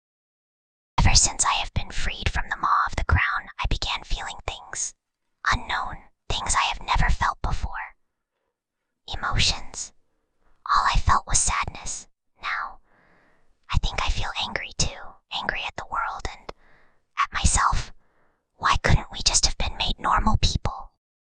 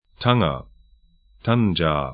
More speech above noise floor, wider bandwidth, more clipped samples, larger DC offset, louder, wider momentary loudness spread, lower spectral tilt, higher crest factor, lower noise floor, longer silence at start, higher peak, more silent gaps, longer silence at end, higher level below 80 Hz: first, 58 dB vs 36 dB; first, 10 kHz vs 5 kHz; neither; neither; second, -25 LUFS vs -21 LUFS; first, 14 LU vs 10 LU; second, -2 dB/octave vs -11.5 dB/octave; about the same, 22 dB vs 22 dB; first, -81 dBFS vs -56 dBFS; first, 1 s vs 0.2 s; about the same, -4 dBFS vs -2 dBFS; neither; first, 0.55 s vs 0 s; first, -30 dBFS vs -42 dBFS